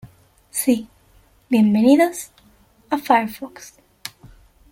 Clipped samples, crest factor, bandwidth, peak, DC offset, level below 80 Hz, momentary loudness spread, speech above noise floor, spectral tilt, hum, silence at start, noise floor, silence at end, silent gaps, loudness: under 0.1%; 18 dB; 17 kHz; -2 dBFS; under 0.1%; -56 dBFS; 22 LU; 37 dB; -5 dB/octave; none; 0.05 s; -55 dBFS; 0.65 s; none; -18 LUFS